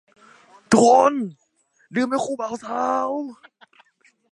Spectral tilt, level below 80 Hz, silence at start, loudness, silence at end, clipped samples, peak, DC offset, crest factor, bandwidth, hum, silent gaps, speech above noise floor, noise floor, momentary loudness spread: -4.5 dB/octave; -62 dBFS; 0.7 s; -20 LUFS; 1 s; under 0.1%; -2 dBFS; under 0.1%; 20 dB; 11.5 kHz; none; none; 44 dB; -63 dBFS; 15 LU